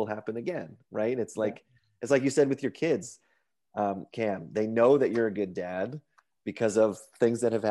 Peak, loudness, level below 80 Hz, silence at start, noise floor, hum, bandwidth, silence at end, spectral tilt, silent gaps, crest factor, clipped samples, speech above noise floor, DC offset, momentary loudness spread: -10 dBFS; -28 LUFS; -76 dBFS; 0 s; -74 dBFS; none; 12 kHz; 0 s; -6 dB/octave; none; 18 dB; under 0.1%; 46 dB; under 0.1%; 15 LU